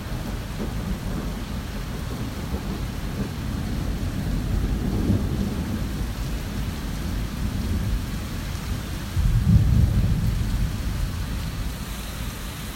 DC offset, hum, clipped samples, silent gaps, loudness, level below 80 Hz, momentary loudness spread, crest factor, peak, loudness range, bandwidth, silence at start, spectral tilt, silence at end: under 0.1%; none; under 0.1%; none; -27 LUFS; -28 dBFS; 9 LU; 20 dB; -6 dBFS; 6 LU; 16.5 kHz; 0 s; -6 dB/octave; 0 s